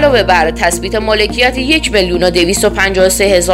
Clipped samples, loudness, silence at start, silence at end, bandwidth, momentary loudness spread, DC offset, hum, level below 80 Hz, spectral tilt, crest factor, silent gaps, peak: 0.3%; -11 LUFS; 0 s; 0 s; 16.5 kHz; 4 LU; 0.2%; none; -26 dBFS; -3 dB/octave; 10 dB; none; 0 dBFS